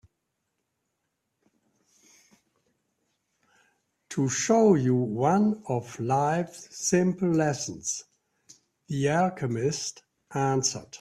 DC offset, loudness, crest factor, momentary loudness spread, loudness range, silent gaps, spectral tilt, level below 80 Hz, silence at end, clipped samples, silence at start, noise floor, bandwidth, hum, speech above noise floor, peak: under 0.1%; -26 LUFS; 20 dB; 11 LU; 5 LU; none; -5 dB/octave; -66 dBFS; 0.05 s; under 0.1%; 4.1 s; -80 dBFS; 13.5 kHz; none; 54 dB; -8 dBFS